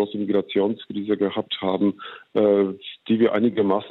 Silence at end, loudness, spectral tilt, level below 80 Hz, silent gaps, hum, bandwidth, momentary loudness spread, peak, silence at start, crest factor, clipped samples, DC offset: 0 s; -22 LUFS; -9 dB/octave; -68 dBFS; none; none; 4.2 kHz; 8 LU; -8 dBFS; 0 s; 14 dB; under 0.1%; under 0.1%